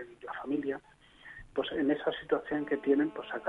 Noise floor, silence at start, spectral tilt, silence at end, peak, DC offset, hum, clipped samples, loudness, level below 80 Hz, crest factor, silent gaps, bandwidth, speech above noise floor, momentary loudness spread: -52 dBFS; 0 s; -7 dB/octave; 0 s; -16 dBFS; under 0.1%; none; under 0.1%; -33 LUFS; -64 dBFS; 18 dB; none; 4.1 kHz; 20 dB; 13 LU